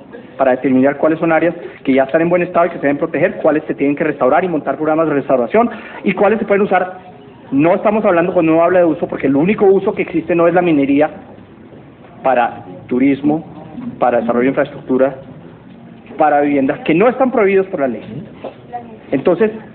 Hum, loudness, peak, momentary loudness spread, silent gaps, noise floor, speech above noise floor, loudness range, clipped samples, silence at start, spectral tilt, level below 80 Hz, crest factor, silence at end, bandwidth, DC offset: none; -14 LUFS; 0 dBFS; 11 LU; none; -38 dBFS; 24 dB; 4 LU; under 0.1%; 0 s; -12 dB/octave; -52 dBFS; 14 dB; 0 s; 4.2 kHz; under 0.1%